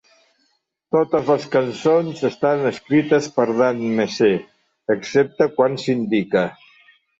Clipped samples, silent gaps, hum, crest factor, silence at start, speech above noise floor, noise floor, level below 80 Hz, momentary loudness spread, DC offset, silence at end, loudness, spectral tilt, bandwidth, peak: under 0.1%; none; none; 16 dB; 0.95 s; 49 dB; -68 dBFS; -62 dBFS; 5 LU; under 0.1%; 0.65 s; -19 LUFS; -6 dB/octave; 8 kHz; -4 dBFS